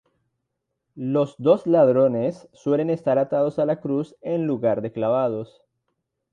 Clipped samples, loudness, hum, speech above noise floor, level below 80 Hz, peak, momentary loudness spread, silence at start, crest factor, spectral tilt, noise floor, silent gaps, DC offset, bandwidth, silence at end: under 0.1%; -22 LUFS; none; 58 dB; -68 dBFS; -4 dBFS; 10 LU; 0.95 s; 18 dB; -9 dB/octave; -79 dBFS; none; under 0.1%; 8.8 kHz; 0.9 s